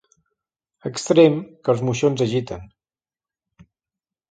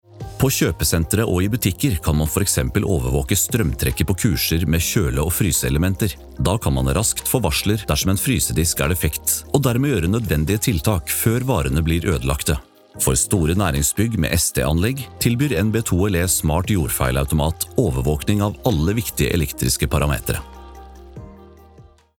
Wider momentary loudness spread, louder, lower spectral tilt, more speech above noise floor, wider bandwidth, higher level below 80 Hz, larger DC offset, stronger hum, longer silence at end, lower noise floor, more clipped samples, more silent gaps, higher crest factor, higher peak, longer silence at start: first, 19 LU vs 3 LU; about the same, -19 LUFS vs -19 LUFS; first, -6 dB/octave vs -4.5 dB/octave; first, over 71 dB vs 28 dB; second, 9.2 kHz vs 19 kHz; second, -56 dBFS vs -32 dBFS; neither; neither; first, 1.65 s vs 0.4 s; first, under -90 dBFS vs -47 dBFS; neither; neither; about the same, 20 dB vs 18 dB; about the same, -2 dBFS vs -2 dBFS; first, 0.85 s vs 0.15 s